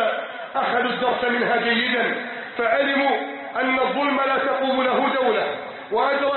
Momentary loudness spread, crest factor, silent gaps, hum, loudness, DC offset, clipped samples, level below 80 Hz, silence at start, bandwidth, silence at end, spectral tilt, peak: 8 LU; 14 dB; none; none; -21 LUFS; under 0.1%; under 0.1%; -66 dBFS; 0 s; 4.3 kHz; 0 s; -8.5 dB/octave; -8 dBFS